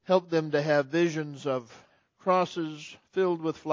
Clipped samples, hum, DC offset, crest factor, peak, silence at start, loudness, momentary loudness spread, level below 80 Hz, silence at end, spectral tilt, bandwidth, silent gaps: under 0.1%; none; under 0.1%; 20 dB; -8 dBFS; 0.1 s; -28 LUFS; 9 LU; -76 dBFS; 0 s; -6 dB/octave; 7.6 kHz; none